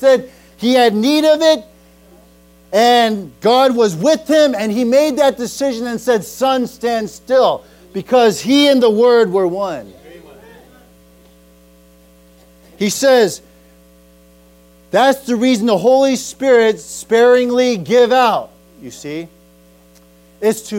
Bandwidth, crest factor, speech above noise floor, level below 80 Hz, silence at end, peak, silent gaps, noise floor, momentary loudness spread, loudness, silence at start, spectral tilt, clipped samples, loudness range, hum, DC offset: 16.5 kHz; 12 dB; 34 dB; -54 dBFS; 0 s; -2 dBFS; none; -47 dBFS; 11 LU; -14 LUFS; 0 s; -4 dB/octave; under 0.1%; 6 LU; none; under 0.1%